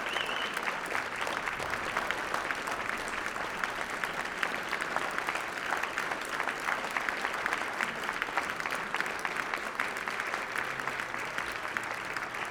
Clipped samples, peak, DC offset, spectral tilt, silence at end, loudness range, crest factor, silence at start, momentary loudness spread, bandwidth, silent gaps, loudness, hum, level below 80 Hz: under 0.1%; -8 dBFS; under 0.1%; -2 dB/octave; 0 s; 1 LU; 26 dB; 0 s; 3 LU; over 20 kHz; none; -33 LUFS; none; -62 dBFS